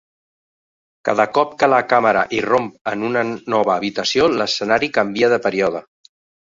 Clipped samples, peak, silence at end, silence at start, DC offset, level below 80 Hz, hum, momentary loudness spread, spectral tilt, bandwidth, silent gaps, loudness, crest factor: under 0.1%; 0 dBFS; 0.7 s; 1.05 s; under 0.1%; -58 dBFS; none; 6 LU; -4 dB/octave; 7.8 kHz; 2.81-2.85 s; -18 LUFS; 18 dB